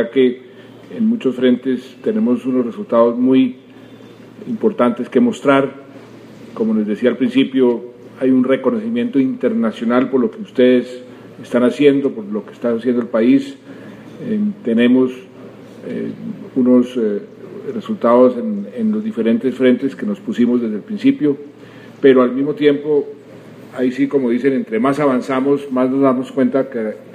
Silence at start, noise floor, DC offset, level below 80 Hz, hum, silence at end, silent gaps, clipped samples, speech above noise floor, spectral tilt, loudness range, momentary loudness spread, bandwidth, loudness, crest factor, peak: 0 s; -39 dBFS; under 0.1%; -66 dBFS; none; 0 s; none; under 0.1%; 23 dB; -7.5 dB/octave; 2 LU; 15 LU; 10 kHz; -16 LUFS; 16 dB; 0 dBFS